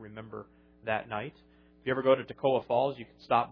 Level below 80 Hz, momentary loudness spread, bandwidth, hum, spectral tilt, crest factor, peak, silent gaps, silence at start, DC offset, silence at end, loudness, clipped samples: -66 dBFS; 17 LU; 5.4 kHz; none; -8.5 dB/octave; 20 dB; -12 dBFS; none; 0 s; under 0.1%; 0 s; -30 LUFS; under 0.1%